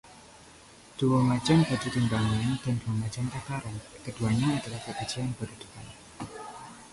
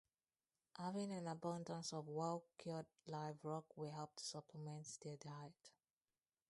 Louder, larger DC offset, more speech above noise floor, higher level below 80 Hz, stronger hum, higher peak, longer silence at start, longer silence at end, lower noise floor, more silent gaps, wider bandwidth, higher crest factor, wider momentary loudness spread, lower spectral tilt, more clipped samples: first, -29 LUFS vs -50 LUFS; neither; second, 24 dB vs over 40 dB; first, -52 dBFS vs -90 dBFS; neither; first, -12 dBFS vs -32 dBFS; second, 0.05 s vs 0.75 s; second, 0.05 s vs 0.8 s; second, -52 dBFS vs under -90 dBFS; neither; about the same, 11.5 kHz vs 11.5 kHz; about the same, 18 dB vs 20 dB; first, 19 LU vs 9 LU; about the same, -6 dB/octave vs -5 dB/octave; neither